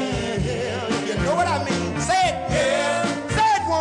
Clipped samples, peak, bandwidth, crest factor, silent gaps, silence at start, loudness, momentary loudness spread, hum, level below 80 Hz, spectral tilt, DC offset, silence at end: under 0.1%; -10 dBFS; 11.5 kHz; 12 dB; none; 0 s; -22 LUFS; 5 LU; none; -40 dBFS; -4.5 dB/octave; under 0.1%; 0 s